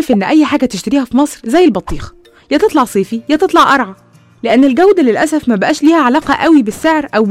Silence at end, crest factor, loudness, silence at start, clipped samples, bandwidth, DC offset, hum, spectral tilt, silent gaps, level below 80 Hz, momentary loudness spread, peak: 0 s; 10 dB; -11 LUFS; 0 s; under 0.1%; 15 kHz; under 0.1%; none; -5 dB/octave; none; -38 dBFS; 7 LU; 0 dBFS